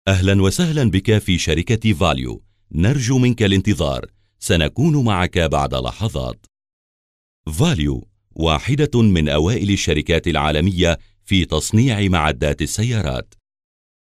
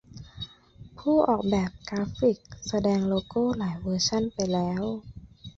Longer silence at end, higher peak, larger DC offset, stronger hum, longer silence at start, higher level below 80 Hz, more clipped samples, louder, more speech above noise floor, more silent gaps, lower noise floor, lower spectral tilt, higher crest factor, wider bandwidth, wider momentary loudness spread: first, 0.9 s vs 0.05 s; first, -4 dBFS vs -8 dBFS; first, 0.2% vs under 0.1%; neither; about the same, 0.05 s vs 0.15 s; first, -32 dBFS vs -50 dBFS; neither; first, -18 LUFS vs -27 LUFS; first, over 73 dB vs 24 dB; first, 6.73-7.44 s vs none; first, under -90 dBFS vs -50 dBFS; about the same, -5.5 dB/octave vs -5.5 dB/octave; second, 14 dB vs 20 dB; first, 15 kHz vs 7.8 kHz; second, 9 LU vs 16 LU